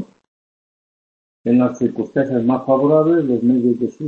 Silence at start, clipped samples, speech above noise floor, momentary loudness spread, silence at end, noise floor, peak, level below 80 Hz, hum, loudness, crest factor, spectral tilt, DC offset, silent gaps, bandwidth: 0 s; under 0.1%; over 74 dB; 7 LU; 0 s; under -90 dBFS; -2 dBFS; -60 dBFS; none; -17 LUFS; 16 dB; -9.5 dB/octave; under 0.1%; 0.28-1.44 s; 6.8 kHz